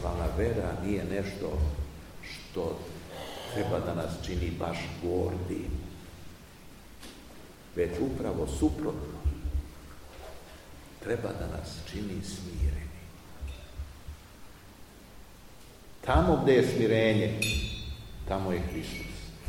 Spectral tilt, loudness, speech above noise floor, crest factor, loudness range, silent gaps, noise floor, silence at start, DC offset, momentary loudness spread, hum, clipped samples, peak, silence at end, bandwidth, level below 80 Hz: -6 dB/octave; -32 LUFS; 21 dB; 22 dB; 11 LU; none; -51 dBFS; 0 s; 0.1%; 24 LU; none; under 0.1%; -10 dBFS; 0 s; 16.5 kHz; -40 dBFS